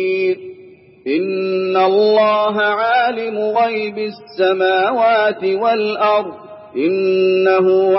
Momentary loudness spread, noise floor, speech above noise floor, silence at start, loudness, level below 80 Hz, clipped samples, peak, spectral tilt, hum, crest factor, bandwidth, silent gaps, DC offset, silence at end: 12 LU; -42 dBFS; 27 dB; 0 s; -16 LUFS; -70 dBFS; under 0.1%; -2 dBFS; -9 dB/octave; none; 14 dB; 5.8 kHz; none; under 0.1%; 0 s